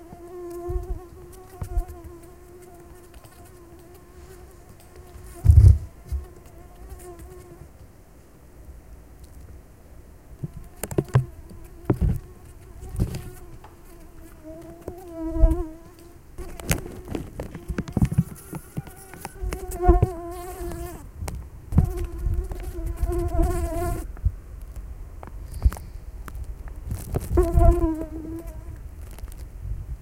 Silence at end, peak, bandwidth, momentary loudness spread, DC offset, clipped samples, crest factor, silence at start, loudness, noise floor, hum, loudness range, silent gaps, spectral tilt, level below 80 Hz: 0 s; 0 dBFS; 16.5 kHz; 24 LU; 0.2%; under 0.1%; 26 dB; 0 s; -26 LUFS; -50 dBFS; none; 19 LU; none; -7.5 dB/octave; -30 dBFS